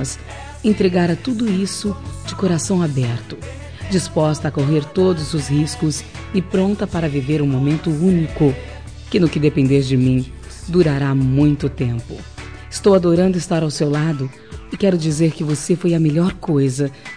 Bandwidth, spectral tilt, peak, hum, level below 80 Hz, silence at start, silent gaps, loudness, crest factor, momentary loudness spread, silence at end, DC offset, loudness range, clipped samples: 10.5 kHz; -6.5 dB/octave; -4 dBFS; none; -38 dBFS; 0 s; none; -18 LUFS; 14 dB; 14 LU; 0 s; 0.4%; 3 LU; under 0.1%